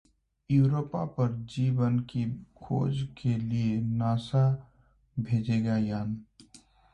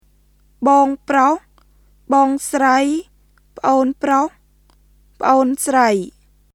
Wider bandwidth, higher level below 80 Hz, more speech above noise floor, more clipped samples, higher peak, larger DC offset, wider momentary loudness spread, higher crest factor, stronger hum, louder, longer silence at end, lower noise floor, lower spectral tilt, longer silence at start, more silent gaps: second, 9 kHz vs 15 kHz; about the same, -58 dBFS vs -54 dBFS; second, 30 dB vs 39 dB; neither; second, -14 dBFS vs 0 dBFS; neither; about the same, 10 LU vs 8 LU; about the same, 16 dB vs 18 dB; second, none vs 50 Hz at -55 dBFS; second, -29 LUFS vs -16 LUFS; about the same, 0.35 s vs 0.45 s; first, -58 dBFS vs -54 dBFS; first, -9 dB/octave vs -4 dB/octave; about the same, 0.5 s vs 0.6 s; neither